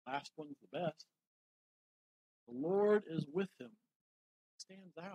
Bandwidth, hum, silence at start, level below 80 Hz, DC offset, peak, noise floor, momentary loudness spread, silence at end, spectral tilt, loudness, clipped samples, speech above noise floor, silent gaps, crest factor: 10 kHz; none; 0.05 s; under -90 dBFS; under 0.1%; -20 dBFS; under -90 dBFS; 22 LU; 0 s; -6.5 dB/octave; -38 LUFS; under 0.1%; over 51 dB; 1.27-2.47 s, 3.96-4.59 s; 22 dB